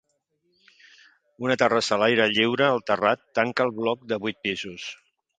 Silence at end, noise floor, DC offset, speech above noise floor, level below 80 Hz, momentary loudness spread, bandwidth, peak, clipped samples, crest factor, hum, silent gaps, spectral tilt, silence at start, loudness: 0.45 s; -72 dBFS; under 0.1%; 49 dB; -66 dBFS; 11 LU; 9.4 kHz; -4 dBFS; under 0.1%; 22 dB; none; none; -4.5 dB/octave; 1.4 s; -23 LUFS